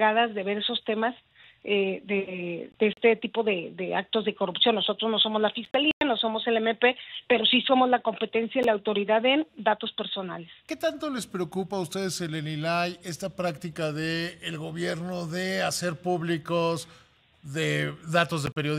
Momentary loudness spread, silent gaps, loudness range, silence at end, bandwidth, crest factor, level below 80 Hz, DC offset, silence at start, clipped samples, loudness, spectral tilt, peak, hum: 10 LU; 5.93-6.01 s; 7 LU; 0 s; 15.5 kHz; 20 dB; -66 dBFS; under 0.1%; 0 s; under 0.1%; -27 LUFS; -4.5 dB/octave; -8 dBFS; none